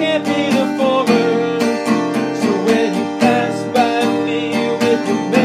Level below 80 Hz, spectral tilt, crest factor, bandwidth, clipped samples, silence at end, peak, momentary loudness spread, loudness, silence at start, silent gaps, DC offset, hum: -62 dBFS; -5 dB/octave; 16 dB; 15 kHz; under 0.1%; 0 s; 0 dBFS; 3 LU; -16 LUFS; 0 s; none; under 0.1%; none